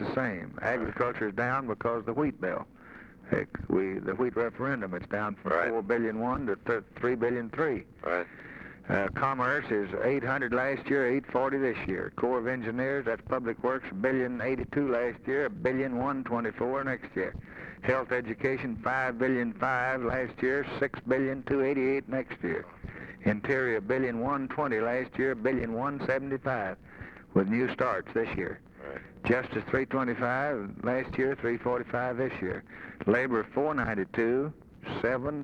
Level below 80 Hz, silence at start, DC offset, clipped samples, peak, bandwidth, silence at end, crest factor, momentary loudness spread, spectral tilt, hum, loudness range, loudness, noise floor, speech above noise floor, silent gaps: -56 dBFS; 0 s; under 0.1%; under 0.1%; -12 dBFS; 8.2 kHz; 0 s; 20 dB; 7 LU; -8.5 dB/octave; none; 2 LU; -30 LUFS; -50 dBFS; 20 dB; none